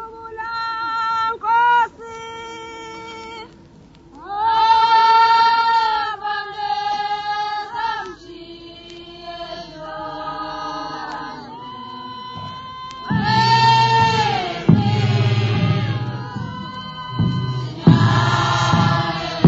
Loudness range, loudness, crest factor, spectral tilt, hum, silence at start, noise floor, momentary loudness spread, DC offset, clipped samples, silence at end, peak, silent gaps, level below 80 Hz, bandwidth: 13 LU; -18 LUFS; 20 dB; -6 dB/octave; none; 0 s; -45 dBFS; 20 LU; under 0.1%; under 0.1%; 0 s; 0 dBFS; none; -48 dBFS; 8 kHz